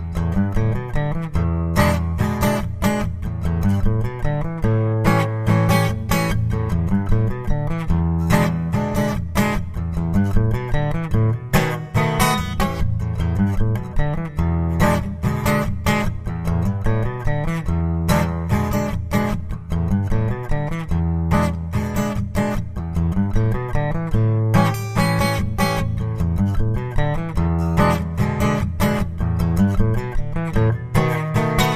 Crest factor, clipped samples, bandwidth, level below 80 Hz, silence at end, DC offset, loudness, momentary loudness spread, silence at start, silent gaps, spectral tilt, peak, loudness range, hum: 18 dB; under 0.1%; 15.5 kHz; -28 dBFS; 0 s; under 0.1%; -21 LUFS; 6 LU; 0 s; none; -6.5 dB/octave; 0 dBFS; 2 LU; none